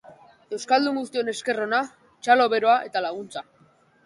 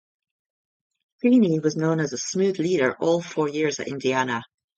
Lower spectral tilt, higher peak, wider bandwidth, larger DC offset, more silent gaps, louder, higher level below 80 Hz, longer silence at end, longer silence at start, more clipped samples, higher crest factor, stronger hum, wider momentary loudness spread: second, -3 dB/octave vs -5.5 dB/octave; about the same, -6 dBFS vs -8 dBFS; first, 11.5 kHz vs 8 kHz; neither; neither; about the same, -23 LUFS vs -23 LUFS; second, -74 dBFS vs -68 dBFS; first, 0.65 s vs 0.35 s; second, 0.1 s vs 1.25 s; neither; about the same, 20 dB vs 16 dB; neither; first, 16 LU vs 7 LU